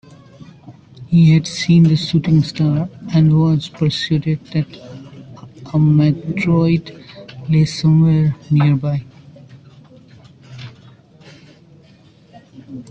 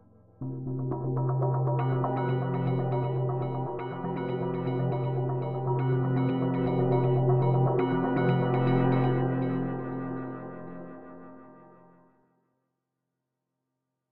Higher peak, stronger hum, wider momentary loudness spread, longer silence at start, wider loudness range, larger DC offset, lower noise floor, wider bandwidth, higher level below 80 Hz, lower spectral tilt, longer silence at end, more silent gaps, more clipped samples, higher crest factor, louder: first, -4 dBFS vs -12 dBFS; neither; first, 23 LU vs 14 LU; first, 0.65 s vs 0 s; second, 5 LU vs 12 LU; second, under 0.1% vs 0.3%; second, -47 dBFS vs -84 dBFS; first, 8.2 kHz vs 4.2 kHz; first, -50 dBFS vs -60 dBFS; second, -7.5 dB/octave vs -12 dB/octave; about the same, 0.1 s vs 0 s; neither; neither; about the same, 14 dB vs 16 dB; first, -15 LUFS vs -28 LUFS